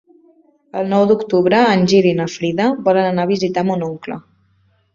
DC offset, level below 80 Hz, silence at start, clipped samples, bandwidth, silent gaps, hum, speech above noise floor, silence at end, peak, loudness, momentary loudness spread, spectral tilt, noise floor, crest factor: under 0.1%; -58 dBFS; 0.75 s; under 0.1%; 7.6 kHz; none; none; 43 dB; 0.75 s; -2 dBFS; -16 LUFS; 13 LU; -6.5 dB/octave; -58 dBFS; 16 dB